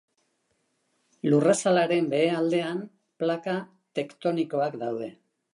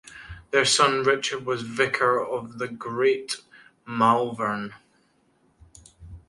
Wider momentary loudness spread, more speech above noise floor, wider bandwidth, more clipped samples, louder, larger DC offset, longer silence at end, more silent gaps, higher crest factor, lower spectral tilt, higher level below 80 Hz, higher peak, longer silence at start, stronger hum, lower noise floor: about the same, 13 LU vs 15 LU; first, 48 dB vs 41 dB; about the same, 11.5 kHz vs 11.5 kHz; neither; about the same, -26 LUFS vs -24 LUFS; neither; first, 0.45 s vs 0.1 s; neither; about the same, 18 dB vs 22 dB; first, -5.5 dB/octave vs -3 dB/octave; second, -80 dBFS vs -56 dBFS; second, -8 dBFS vs -4 dBFS; first, 1.25 s vs 0.05 s; neither; first, -73 dBFS vs -65 dBFS